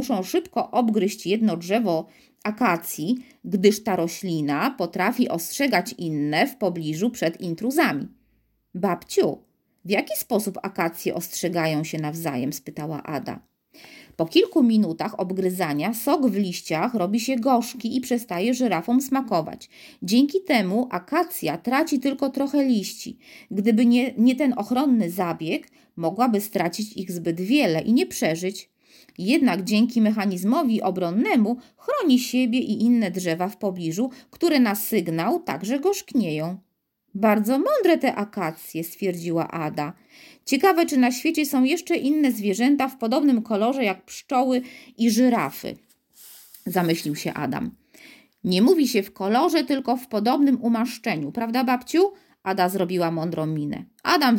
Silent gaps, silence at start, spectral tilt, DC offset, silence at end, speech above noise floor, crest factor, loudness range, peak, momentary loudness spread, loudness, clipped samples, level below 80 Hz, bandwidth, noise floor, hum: none; 0 s; -5 dB/octave; under 0.1%; 0 s; 48 dB; 18 dB; 4 LU; -4 dBFS; 10 LU; -23 LUFS; under 0.1%; -68 dBFS; 17 kHz; -71 dBFS; none